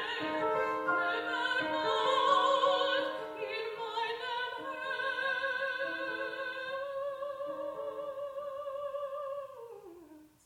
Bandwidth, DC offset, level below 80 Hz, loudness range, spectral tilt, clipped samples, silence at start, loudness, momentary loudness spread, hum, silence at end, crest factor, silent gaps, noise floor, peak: 16 kHz; under 0.1%; -76 dBFS; 9 LU; -3 dB/octave; under 0.1%; 0 s; -33 LUFS; 12 LU; none; 0.2 s; 18 dB; none; -56 dBFS; -16 dBFS